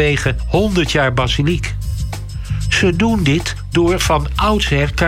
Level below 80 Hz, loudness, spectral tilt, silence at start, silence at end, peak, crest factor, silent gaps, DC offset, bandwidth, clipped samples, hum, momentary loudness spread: -24 dBFS; -16 LUFS; -5 dB/octave; 0 s; 0 s; -4 dBFS; 12 dB; none; under 0.1%; 16 kHz; under 0.1%; none; 9 LU